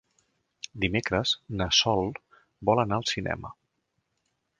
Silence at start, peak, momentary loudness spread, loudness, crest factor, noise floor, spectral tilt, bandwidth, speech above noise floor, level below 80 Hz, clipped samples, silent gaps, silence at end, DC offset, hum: 0.75 s; -8 dBFS; 20 LU; -27 LUFS; 22 dB; -78 dBFS; -4 dB/octave; 10.5 kHz; 51 dB; -50 dBFS; under 0.1%; none; 1.1 s; under 0.1%; none